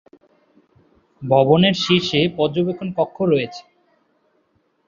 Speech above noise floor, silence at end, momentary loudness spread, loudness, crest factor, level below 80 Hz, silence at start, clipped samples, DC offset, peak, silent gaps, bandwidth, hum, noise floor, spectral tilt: 47 dB; 1.25 s; 11 LU; -18 LUFS; 20 dB; -56 dBFS; 1.2 s; under 0.1%; under 0.1%; -2 dBFS; none; 7.4 kHz; none; -65 dBFS; -6 dB/octave